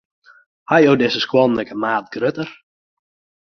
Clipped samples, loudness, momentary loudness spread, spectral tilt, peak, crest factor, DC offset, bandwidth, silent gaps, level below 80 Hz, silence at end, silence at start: under 0.1%; -17 LUFS; 9 LU; -6 dB/octave; -2 dBFS; 18 dB; under 0.1%; 6.4 kHz; none; -58 dBFS; 0.9 s; 0.7 s